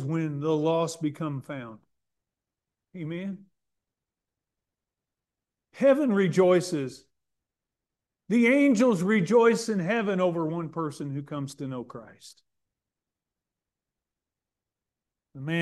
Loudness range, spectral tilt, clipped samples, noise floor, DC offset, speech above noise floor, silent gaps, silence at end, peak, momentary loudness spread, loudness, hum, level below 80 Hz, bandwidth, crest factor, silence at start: 19 LU; -6.5 dB/octave; under 0.1%; -89 dBFS; under 0.1%; 64 dB; none; 0 s; -10 dBFS; 17 LU; -25 LUFS; none; -74 dBFS; 12.5 kHz; 18 dB; 0 s